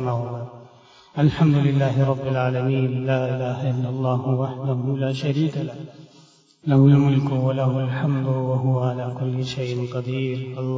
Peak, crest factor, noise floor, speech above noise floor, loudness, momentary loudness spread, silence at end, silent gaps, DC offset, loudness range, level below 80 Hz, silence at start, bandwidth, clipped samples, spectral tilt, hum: -4 dBFS; 16 dB; -53 dBFS; 32 dB; -22 LUFS; 10 LU; 0 s; none; under 0.1%; 4 LU; -54 dBFS; 0 s; 7.6 kHz; under 0.1%; -8.5 dB/octave; none